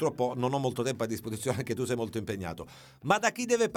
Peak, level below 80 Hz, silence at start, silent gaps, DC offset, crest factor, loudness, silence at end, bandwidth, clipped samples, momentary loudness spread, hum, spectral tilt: -10 dBFS; -62 dBFS; 0 s; none; under 0.1%; 20 dB; -31 LUFS; 0 s; 18.5 kHz; under 0.1%; 12 LU; none; -5 dB/octave